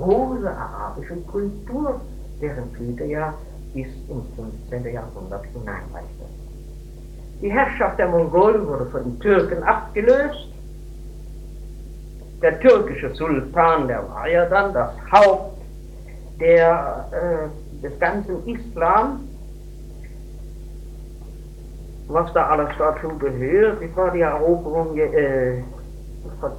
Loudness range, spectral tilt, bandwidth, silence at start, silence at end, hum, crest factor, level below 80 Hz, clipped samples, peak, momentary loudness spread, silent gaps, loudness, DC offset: 12 LU; -7.5 dB/octave; 13 kHz; 0 s; 0 s; none; 20 dB; -36 dBFS; under 0.1%; 0 dBFS; 23 LU; none; -20 LUFS; under 0.1%